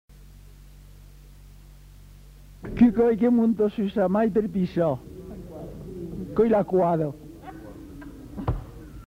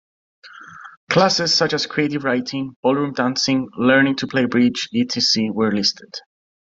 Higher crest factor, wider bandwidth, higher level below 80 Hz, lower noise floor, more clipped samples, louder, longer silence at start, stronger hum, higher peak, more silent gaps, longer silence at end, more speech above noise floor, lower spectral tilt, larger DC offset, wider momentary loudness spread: about the same, 18 dB vs 18 dB; about the same, 8.2 kHz vs 7.8 kHz; first, -44 dBFS vs -62 dBFS; first, -47 dBFS vs -40 dBFS; neither; second, -23 LUFS vs -18 LUFS; second, 0.2 s vs 0.45 s; neither; second, -6 dBFS vs -2 dBFS; second, none vs 0.97-1.07 s, 2.76-2.83 s; second, 0.05 s vs 0.5 s; first, 26 dB vs 21 dB; first, -9 dB/octave vs -4 dB/octave; neither; first, 22 LU vs 9 LU